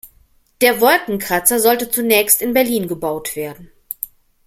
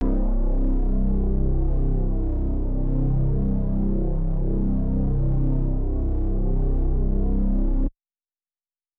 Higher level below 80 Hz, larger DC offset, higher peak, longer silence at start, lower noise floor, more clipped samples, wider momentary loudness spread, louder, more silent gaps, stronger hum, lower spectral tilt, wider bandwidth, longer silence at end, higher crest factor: second, -52 dBFS vs -22 dBFS; neither; first, 0 dBFS vs -12 dBFS; about the same, 0.05 s vs 0 s; second, -54 dBFS vs under -90 dBFS; neither; first, 15 LU vs 3 LU; first, -15 LUFS vs -26 LUFS; neither; neither; second, -2.5 dB/octave vs -13.5 dB/octave; first, 17 kHz vs 1.6 kHz; second, 0.55 s vs 1.1 s; first, 18 dB vs 10 dB